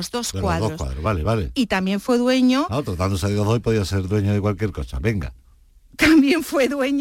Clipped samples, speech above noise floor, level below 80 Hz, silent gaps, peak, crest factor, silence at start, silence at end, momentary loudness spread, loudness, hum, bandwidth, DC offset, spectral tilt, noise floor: under 0.1%; 32 dB; -36 dBFS; none; -6 dBFS; 14 dB; 0 s; 0 s; 10 LU; -20 LUFS; none; 16.5 kHz; under 0.1%; -6 dB/octave; -51 dBFS